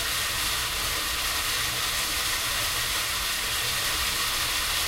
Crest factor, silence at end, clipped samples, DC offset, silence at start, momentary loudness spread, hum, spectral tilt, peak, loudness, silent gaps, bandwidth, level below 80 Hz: 14 dB; 0 s; under 0.1%; under 0.1%; 0 s; 1 LU; none; 0 dB/octave; -14 dBFS; -25 LUFS; none; 16 kHz; -42 dBFS